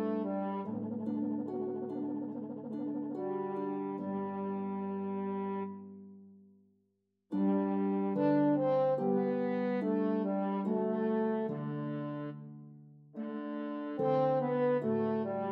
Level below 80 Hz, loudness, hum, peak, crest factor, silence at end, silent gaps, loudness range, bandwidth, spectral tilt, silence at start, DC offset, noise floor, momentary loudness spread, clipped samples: -90 dBFS; -34 LUFS; none; -20 dBFS; 14 dB; 0 s; none; 7 LU; 5.2 kHz; -11 dB/octave; 0 s; under 0.1%; -79 dBFS; 12 LU; under 0.1%